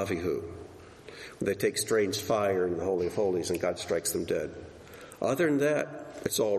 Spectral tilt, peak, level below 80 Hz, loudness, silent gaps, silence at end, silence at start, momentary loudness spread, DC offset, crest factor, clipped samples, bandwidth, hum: -4 dB/octave; -12 dBFS; -60 dBFS; -30 LUFS; none; 0 s; 0 s; 19 LU; under 0.1%; 18 dB; under 0.1%; 13 kHz; none